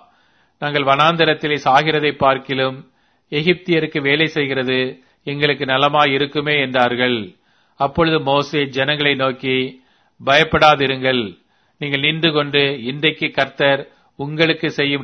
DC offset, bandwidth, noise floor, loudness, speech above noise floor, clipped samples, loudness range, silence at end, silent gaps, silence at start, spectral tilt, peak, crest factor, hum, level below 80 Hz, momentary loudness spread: under 0.1%; 6.8 kHz; -58 dBFS; -17 LUFS; 41 dB; under 0.1%; 2 LU; 0 s; none; 0.6 s; -5.5 dB/octave; 0 dBFS; 18 dB; none; -50 dBFS; 10 LU